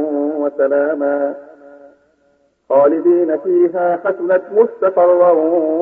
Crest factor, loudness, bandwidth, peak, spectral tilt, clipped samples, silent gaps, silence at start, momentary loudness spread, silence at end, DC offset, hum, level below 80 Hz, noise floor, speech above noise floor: 14 dB; -15 LUFS; 3.1 kHz; -2 dBFS; -10 dB/octave; under 0.1%; none; 0 s; 7 LU; 0 s; under 0.1%; none; -70 dBFS; -58 dBFS; 45 dB